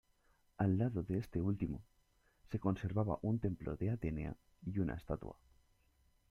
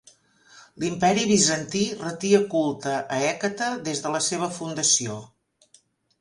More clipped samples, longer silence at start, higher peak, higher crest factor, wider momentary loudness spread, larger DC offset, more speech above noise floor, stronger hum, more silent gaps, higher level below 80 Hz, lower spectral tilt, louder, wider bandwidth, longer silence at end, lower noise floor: neither; about the same, 0.6 s vs 0.55 s; second, -20 dBFS vs -6 dBFS; about the same, 20 dB vs 20 dB; about the same, 9 LU vs 10 LU; neither; about the same, 35 dB vs 36 dB; neither; neither; first, -56 dBFS vs -62 dBFS; first, -10 dB/octave vs -3 dB/octave; second, -40 LUFS vs -23 LUFS; second, 6.6 kHz vs 11.5 kHz; about the same, 0.95 s vs 0.95 s; first, -74 dBFS vs -60 dBFS